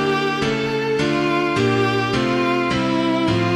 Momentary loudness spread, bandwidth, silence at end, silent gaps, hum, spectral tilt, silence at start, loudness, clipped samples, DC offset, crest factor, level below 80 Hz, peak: 2 LU; 13.5 kHz; 0 s; none; none; -6 dB/octave; 0 s; -19 LUFS; under 0.1%; under 0.1%; 12 dB; -46 dBFS; -6 dBFS